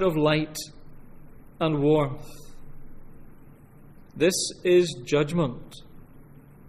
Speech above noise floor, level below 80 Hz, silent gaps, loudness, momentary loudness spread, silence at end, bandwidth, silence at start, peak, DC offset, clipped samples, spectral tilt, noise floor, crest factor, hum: 24 dB; -48 dBFS; none; -24 LUFS; 22 LU; 0.45 s; 15 kHz; 0 s; -8 dBFS; under 0.1%; under 0.1%; -5 dB/octave; -48 dBFS; 18 dB; none